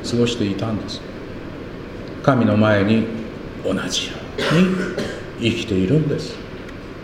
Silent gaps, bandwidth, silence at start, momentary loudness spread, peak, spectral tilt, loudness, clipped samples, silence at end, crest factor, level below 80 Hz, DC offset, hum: none; 15 kHz; 0 s; 17 LU; -2 dBFS; -6 dB/octave; -20 LUFS; under 0.1%; 0 s; 20 dB; -42 dBFS; under 0.1%; none